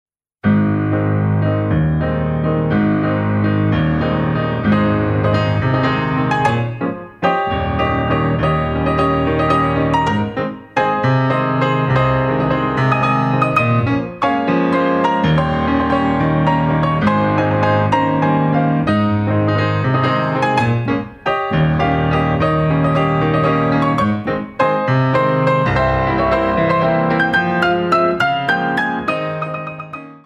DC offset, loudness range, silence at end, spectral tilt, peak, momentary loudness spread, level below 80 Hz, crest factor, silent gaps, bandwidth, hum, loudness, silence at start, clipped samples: under 0.1%; 2 LU; 0.1 s; -8 dB/octave; 0 dBFS; 4 LU; -36 dBFS; 14 dB; none; 8.8 kHz; none; -16 LUFS; 0.45 s; under 0.1%